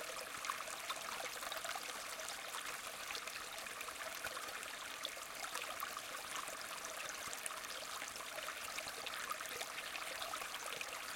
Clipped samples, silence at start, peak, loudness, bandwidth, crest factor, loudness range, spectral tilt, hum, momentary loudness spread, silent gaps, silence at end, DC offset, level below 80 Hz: under 0.1%; 0 s; -20 dBFS; -44 LUFS; 17 kHz; 26 dB; 1 LU; 0.5 dB/octave; none; 2 LU; none; 0 s; under 0.1%; -76 dBFS